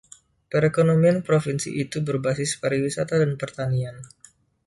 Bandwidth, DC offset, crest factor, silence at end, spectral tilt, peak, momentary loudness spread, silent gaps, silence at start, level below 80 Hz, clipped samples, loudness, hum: 11.5 kHz; under 0.1%; 16 dB; 0.6 s; -6 dB/octave; -8 dBFS; 9 LU; none; 0.5 s; -58 dBFS; under 0.1%; -23 LUFS; none